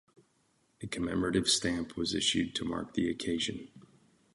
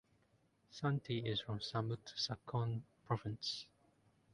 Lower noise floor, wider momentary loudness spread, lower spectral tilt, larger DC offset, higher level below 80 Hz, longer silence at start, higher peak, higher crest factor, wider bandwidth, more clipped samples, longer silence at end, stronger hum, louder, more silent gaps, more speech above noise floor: about the same, -72 dBFS vs -75 dBFS; about the same, 9 LU vs 7 LU; second, -3.5 dB/octave vs -5.5 dB/octave; neither; first, -56 dBFS vs -70 dBFS; about the same, 0.8 s vs 0.7 s; first, -16 dBFS vs -22 dBFS; about the same, 18 dB vs 22 dB; about the same, 11.5 kHz vs 11 kHz; neither; second, 0.55 s vs 0.7 s; neither; first, -32 LUFS vs -42 LUFS; neither; first, 40 dB vs 34 dB